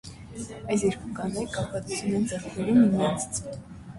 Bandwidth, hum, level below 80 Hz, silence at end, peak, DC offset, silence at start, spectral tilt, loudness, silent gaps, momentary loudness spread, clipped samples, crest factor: 11.5 kHz; none; -52 dBFS; 0 s; -10 dBFS; under 0.1%; 0.05 s; -5.5 dB/octave; -27 LUFS; none; 18 LU; under 0.1%; 18 dB